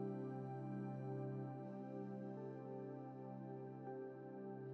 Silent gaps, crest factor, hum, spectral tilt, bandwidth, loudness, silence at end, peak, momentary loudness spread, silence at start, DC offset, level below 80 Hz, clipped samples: none; 14 dB; none; -10 dB/octave; 4.3 kHz; -50 LUFS; 0 s; -34 dBFS; 5 LU; 0 s; under 0.1%; under -90 dBFS; under 0.1%